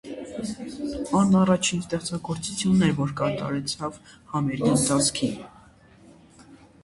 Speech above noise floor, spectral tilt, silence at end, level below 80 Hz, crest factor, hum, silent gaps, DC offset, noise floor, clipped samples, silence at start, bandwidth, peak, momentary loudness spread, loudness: 29 dB; -5 dB/octave; 0.3 s; -52 dBFS; 20 dB; none; none; under 0.1%; -52 dBFS; under 0.1%; 0.05 s; 11.5 kHz; -6 dBFS; 13 LU; -24 LUFS